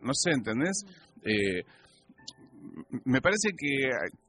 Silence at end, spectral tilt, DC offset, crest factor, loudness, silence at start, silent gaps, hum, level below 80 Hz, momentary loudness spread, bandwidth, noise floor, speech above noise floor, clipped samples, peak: 0.15 s; -3.5 dB/octave; under 0.1%; 20 dB; -29 LUFS; 0 s; none; none; -62 dBFS; 21 LU; 11.5 kHz; -52 dBFS; 22 dB; under 0.1%; -12 dBFS